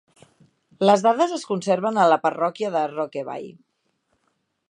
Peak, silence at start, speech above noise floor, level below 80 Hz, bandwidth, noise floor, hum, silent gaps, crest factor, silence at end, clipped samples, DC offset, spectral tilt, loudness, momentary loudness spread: -2 dBFS; 0.8 s; 51 dB; -78 dBFS; 10.5 kHz; -72 dBFS; none; none; 20 dB; 1.2 s; under 0.1%; under 0.1%; -5 dB/octave; -21 LUFS; 14 LU